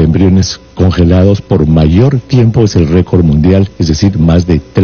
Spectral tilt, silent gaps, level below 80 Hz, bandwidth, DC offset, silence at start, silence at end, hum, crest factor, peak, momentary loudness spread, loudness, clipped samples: -7.5 dB/octave; none; -22 dBFS; 6.8 kHz; under 0.1%; 0 s; 0 s; none; 8 dB; 0 dBFS; 4 LU; -9 LUFS; under 0.1%